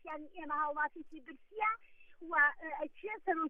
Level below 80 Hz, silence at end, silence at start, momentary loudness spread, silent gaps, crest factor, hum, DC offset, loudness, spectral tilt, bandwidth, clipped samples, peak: -70 dBFS; 0 s; 0.05 s; 21 LU; none; 20 dB; none; under 0.1%; -36 LUFS; -5.5 dB/octave; 3.8 kHz; under 0.1%; -18 dBFS